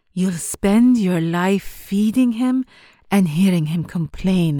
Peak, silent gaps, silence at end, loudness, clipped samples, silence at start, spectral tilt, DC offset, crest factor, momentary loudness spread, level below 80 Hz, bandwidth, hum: -6 dBFS; none; 0 s; -19 LUFS; under 0.1%; 0.15 s; -6.5 dB/octave; under 0.1%; 12 dB; 8 LU; -44 dBFS; 20 kHz; none